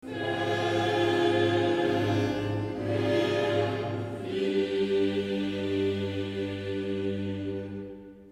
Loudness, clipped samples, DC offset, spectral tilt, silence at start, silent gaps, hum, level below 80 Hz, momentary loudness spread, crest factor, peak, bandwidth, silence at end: -28 LUFS; under 0.1%; under 0.1%; -6.5 dB/octave; 0.05 s; none; none; -60 dBFS; 9 LU; 16 dB; -12 dBFS; 13 kHz; 0 s